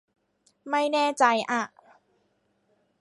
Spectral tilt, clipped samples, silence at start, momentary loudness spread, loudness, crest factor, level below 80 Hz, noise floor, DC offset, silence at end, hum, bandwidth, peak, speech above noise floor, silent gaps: -2.5 dB/octave; under 0.1%; 0.65 s; 8 LU; -25 LUFS; 22 dB; -82 dBFS; -71 dBFS; under 0.1%; 1.35 s; none; 11.5 kHz; -6 dBFS; 47 dB; none